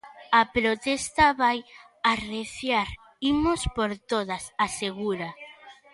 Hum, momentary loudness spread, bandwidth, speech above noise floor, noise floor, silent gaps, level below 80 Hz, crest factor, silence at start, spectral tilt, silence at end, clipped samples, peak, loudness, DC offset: none; 12 LU; 11.5 kHz; 23 dB; -49 dBFS; none; -46 dBFS; 18 dB; 0.05 s; -3.5 dB/octave; 0.2 s; under 0.1%; -8 dBFS; -26 LUFS; under 0.1%